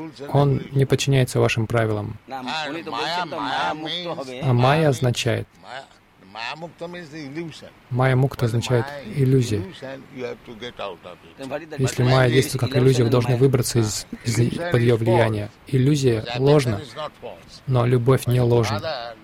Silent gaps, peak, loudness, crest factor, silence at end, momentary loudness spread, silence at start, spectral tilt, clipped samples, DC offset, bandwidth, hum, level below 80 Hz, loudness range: none; -4 dBFS; -21 LUFS; 16 dB; 0.1 s; 16 LU; 0 s; -6 dB/octave; under 0.1%; under 0.1%; 15.5 kHz; none; -48 dBFS; 6 LU